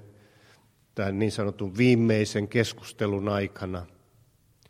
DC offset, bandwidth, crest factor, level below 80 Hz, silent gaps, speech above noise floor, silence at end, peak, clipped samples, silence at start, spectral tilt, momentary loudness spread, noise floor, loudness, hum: under 0.1%; 15 kHz; 22 dB; -60 dBFS; none; 36 dB; 0.85 s; -6 dBFS; under 0.1%; 0.95 s; -6.5 dB/octave; 14 LU; -62 dBFS; -27 LUFS; none